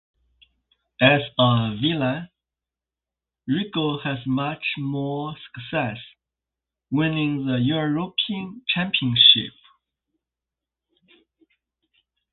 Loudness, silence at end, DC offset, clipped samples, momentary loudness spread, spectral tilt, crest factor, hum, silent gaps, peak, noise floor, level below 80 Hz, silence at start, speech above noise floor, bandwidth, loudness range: -21 LUFS; 2.85 s; under 0.1%; under 0.1%; 14 LU; -10 dB/octave; 24 dB; none; none; -2 dBFS; -89 dBFS; -58 dBFS; 1 s; 67 dB; 4.4 kHz; 8 LU